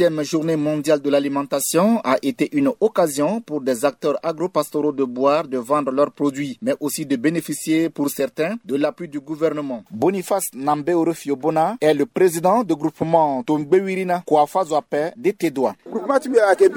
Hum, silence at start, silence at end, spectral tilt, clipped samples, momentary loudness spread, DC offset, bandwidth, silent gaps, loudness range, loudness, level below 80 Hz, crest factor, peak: none; 0 s; 0 s; -5 dB/octave; under 0.1%; 6 LU; under 0.1%; 19.5 kHz; none; 4 LU; -20 LUFS; -66 dBFS; 18 dB; -2 dBFS